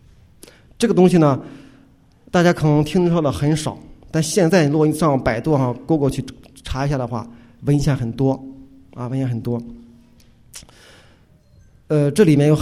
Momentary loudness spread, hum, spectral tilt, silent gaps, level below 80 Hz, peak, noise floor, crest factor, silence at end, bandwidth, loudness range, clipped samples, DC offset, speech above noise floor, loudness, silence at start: 20 LU; none; -6.5 dB/octave; none; -42 dBFS; 0 dBFS; -51 dBFS; 18 dB; 0 s; 15 kHz; 9 LU; under 0.1%; under 0.1%; 34 dB; -18 LUFS; 0.8 s